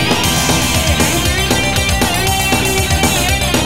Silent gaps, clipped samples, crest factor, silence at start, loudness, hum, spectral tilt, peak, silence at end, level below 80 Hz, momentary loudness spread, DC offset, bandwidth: none; under 0.1%; 14 dB; 0 s; -13 LUFS; none; -3 dB/octave; 0 dBFS; 0 s; -24 dBFS; 1 LU; 2%; 16.5 kHz